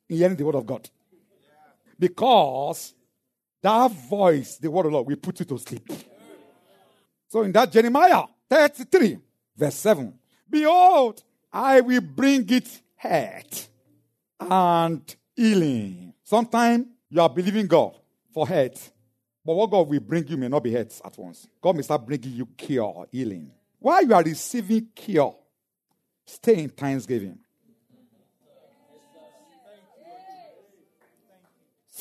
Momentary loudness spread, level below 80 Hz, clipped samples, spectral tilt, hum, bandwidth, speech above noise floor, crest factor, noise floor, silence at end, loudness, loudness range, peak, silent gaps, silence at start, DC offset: 18 LU; -74 dBFS; under 0.1%; -5.5 dB/octave; none; 13.5 kHz; 59 dB; 20 dB; -80 dBFS; 0 s; -22 LUFS; 8 LU; -4 dBFS; none; 0.1 s; under 0.1%